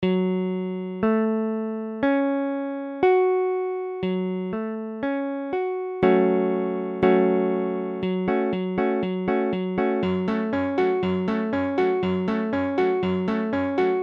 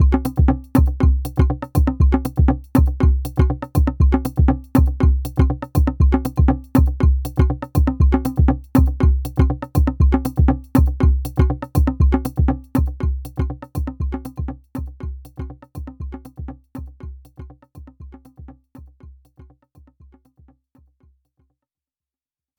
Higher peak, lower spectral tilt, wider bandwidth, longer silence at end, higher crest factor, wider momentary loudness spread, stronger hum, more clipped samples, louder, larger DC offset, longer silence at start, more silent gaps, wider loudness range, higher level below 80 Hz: second, -4 dBFS vs 0 dBFS; about the same, -9 dB/octave vs -9 dB/octave; second, 5.6 kHz vs over 20 kHz; second, 0 s vs 3.5 s; about the same, 18 dB vs 18 dB; second, 8 LU vs 17 LU; neither; neither; second, -24 LUFS vs -19 LUFS; neither; about the same, 0 s vs 0 s; neither; second, 2 LU vs 17 LU; second, -58 dBFS vs -22 dBFS